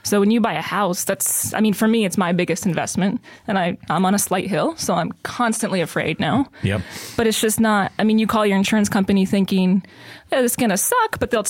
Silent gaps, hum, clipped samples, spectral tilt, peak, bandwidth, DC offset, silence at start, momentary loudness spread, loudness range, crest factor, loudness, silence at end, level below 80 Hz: none; none; under 0.1%; -4.5 dB/octave; -4 dBFS; 17 kHz; under 0.1%; 0.05 s; 6 LU; 3 LU; 16 dB; -19 LUFS; 0 s; -52 dBFS